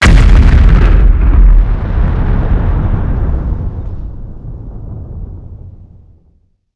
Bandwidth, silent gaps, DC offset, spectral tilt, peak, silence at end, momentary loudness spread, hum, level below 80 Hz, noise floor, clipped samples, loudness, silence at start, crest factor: 8.4 kHz; none; under 0.1%; -7 dB/octave; 0 dBFS; 0.9 s; 20 LU; none; -10 dBFS; -52 dBFS; 3%; -12 LUFS; 0 s; 10 dB